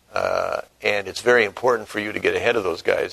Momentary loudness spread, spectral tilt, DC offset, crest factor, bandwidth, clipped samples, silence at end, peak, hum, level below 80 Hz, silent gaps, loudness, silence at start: 7 LU; -3.5 dB/octave; under 0.1%; 20 dB; 13.5 kHz; under 0.1%; 0 s; -2 dBFS; none; -58 dBFS; none; -21 LUFS; 0.15 s